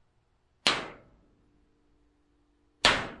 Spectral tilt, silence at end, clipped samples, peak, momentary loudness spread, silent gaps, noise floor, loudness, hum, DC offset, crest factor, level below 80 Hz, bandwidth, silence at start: -1.5 dB/octave; 0.05 s; under 0.1%; -6 dBFS; 11 LU; none; -70 dBFS; -27 LUFS; none; under 0.1%; 28 dB; -56 dBFS; 11.5 kHz; 0.65 s